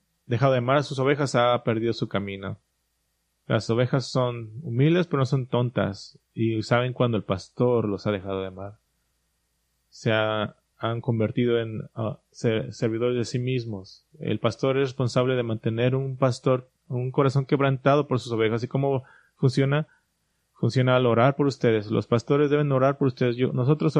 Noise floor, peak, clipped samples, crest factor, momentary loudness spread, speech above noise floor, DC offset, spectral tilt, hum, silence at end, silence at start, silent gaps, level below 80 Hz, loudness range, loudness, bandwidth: -74 dBFS; -6 dBFS; under 0.1%; 18 dB; 10 LU; 50 dB; under 0.1%; -7 dB/octave; none; 0 s; 0.3 s; none; -62 dBFS; 5 LU; -25 LUFS; 9.8 kHz